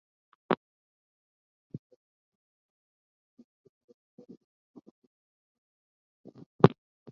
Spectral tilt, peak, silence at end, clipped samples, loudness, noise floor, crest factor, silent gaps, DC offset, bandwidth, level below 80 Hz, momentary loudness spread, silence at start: -7 dB/octave; -2 dBFS; 0.45 s; under 0.1%; -27 LUFS; under -90 dBFS; 34 dB; 0.57-1.70 s, 1.79-1.90 s, 1.96-3.37 s, 3.44-3.88 s, 3.94-4.18 s, 4.44-4.74 s, 4.91-6.24 s, 6.46-6.59 s; under 0.1%; 6.8 kHz; -70 dBFS; 24 LU; 0.5 s